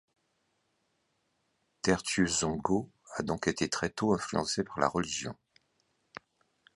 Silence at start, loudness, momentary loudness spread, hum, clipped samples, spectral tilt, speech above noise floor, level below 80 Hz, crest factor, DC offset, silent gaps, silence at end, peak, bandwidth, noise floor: 1.85 s; -31 LUFS; 21 LU; none; under 0.1%; -4 dB/octave; 46 dB; -58 dBFS; 24 dB; under 0.1%; none; 1.45 s; -10 dBFS; 11.5 kHz; -77 dBFS